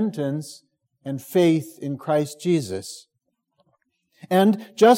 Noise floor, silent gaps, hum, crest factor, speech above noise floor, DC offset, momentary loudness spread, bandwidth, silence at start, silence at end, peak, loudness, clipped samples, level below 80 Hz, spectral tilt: -76 dBFS; none; none; 18 dB; 55 dB; under 0.1%; 17 LU; 16.5 kHz; 0 s; 0 s; -4 dBFS; -23 LUFS; under 0.1%; -72 dBFS; -6 dB/octave